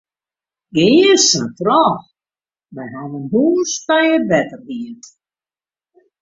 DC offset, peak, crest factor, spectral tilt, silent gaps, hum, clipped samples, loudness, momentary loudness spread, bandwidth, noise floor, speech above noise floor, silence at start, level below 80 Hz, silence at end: under 0.1%; -2 dBFS; 16 dB; -3.5 dB/octave; none; none; under 0.1%; -14 LUFS; 18 LU; 7.8 kHz; under -90 dBFS; over 75 dB; 0.75 s; -58 dBFS; 1.25 s